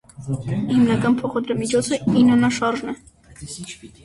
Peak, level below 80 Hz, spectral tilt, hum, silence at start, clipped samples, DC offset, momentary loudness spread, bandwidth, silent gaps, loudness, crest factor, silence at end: -6 dBFS; -50 dBFS; -6 dB/octave; none; 0.2 s; under 0.1%; under 0.1%; 19 LU; 11.5 kHz; none; -19 LUFS; 14 dB; 0.15 s